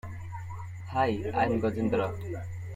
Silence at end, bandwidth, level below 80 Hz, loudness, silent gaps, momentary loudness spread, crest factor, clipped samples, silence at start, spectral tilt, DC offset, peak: 0 s; 13.5 kHz; -54 dBFS; -31 LUFS; none; 13 LU; 18 dB; under 0.1%; 0.05 s; -7.5 dB/octave; under 0.1%; -14 dBFS